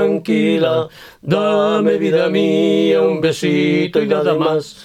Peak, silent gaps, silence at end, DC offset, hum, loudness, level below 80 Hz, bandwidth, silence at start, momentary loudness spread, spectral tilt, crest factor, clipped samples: -2 dBFS; none; 0 s; under 0.1%; none; -15 LUFS; -58 dBFS; 14 kHz; 0 s; 4 LU; -6.5 dB/octave; 12 dB; under 0.1%